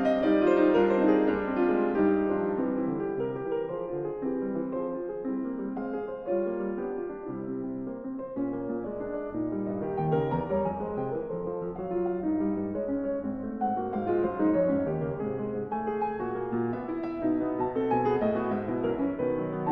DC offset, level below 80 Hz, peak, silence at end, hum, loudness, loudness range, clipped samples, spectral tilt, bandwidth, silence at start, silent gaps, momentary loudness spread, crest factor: under 0.1%; -56 dBFS; -12 dBFS; 0 s; none; -29 LUFS; 6 LU; under 0.1%; -9.5 dB/octave; 5.6 kHz; 0 s; none; 10 LU; 18 dB